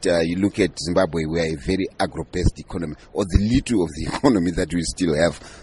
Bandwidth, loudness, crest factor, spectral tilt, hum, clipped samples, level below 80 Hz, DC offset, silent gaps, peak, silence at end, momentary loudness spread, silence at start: 11.5 kHz; -22 LUFS; 20 dB; -5.5 dB/octave; none; under 0.1%; -32 dBFS; under 0.1%; none; -2 dBFS; 0 s; 7 LU; 0 s